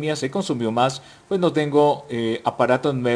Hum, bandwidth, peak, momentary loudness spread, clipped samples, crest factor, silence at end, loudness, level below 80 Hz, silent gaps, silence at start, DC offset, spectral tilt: none; 10.5 kHz; -4 dBFS; 7 LU; under 0.1%; 16 dB; 0 s; -21 LUFS; -62 dBFS; none; 0 s; under 0.1%; -6 dB/octave